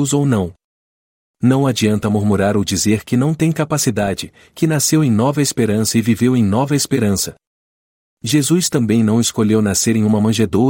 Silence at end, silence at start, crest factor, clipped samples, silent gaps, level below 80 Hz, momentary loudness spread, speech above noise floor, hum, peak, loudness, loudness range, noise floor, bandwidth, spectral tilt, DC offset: 0 s; 0 s; 14 dB; under 0.1%; 0.64-1.34 s, 7.47-8.17 s; -50 dBFS; 6 LU; over 75 dB; none; -2 dBFS; -16 LUFS; 1 LU; under -90 dBFS; 16.5 kHz; -5 dB/octave; under 0.1%